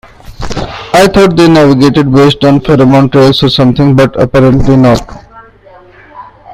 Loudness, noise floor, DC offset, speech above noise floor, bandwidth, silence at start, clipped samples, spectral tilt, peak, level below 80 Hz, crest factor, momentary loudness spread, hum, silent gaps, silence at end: -6 LUFS; -36 dBFS; under 0.1%; 31 dB; 15 kHz; 0.3 s; 2%; -6.5 dB/octave; 0 dBFS; -26 dBFS; 6 dB; 9 LU; none; none; 0 s